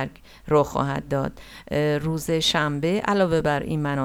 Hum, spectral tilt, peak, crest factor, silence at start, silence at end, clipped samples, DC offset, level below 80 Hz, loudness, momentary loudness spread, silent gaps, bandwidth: none; -5.5 dB/octave; -6 dBFS; 16 dB; 0 s; 0 s; under 0.1%; under 0.1%; -46 dBFS; -23 LUFS; 7 LU; none; 16.5 kHz